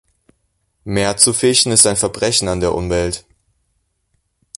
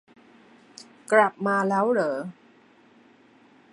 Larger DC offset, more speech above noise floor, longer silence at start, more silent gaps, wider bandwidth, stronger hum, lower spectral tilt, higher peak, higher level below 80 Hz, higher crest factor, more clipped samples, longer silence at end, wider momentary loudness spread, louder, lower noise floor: neither; first, 51 dB vs 34 dB; second, 0.85 s vs 1.1 s; neither; first, 16 kHz vs 11.5 kHz; neither; second, -2.5 dB/octave vs -6 dB/octave; first, 0 dBFS vs -4 dBFS; first, -38 dBFS vs -78 dBFS; about the same, 18 dB vs 22 dB; neither; about the same, 1.4 s vs 1.4 s; second, 12 LU vs 25 LU; first, -14 LUFS vs -23 LUFS; first, -67 dBFS vs -56 dBFS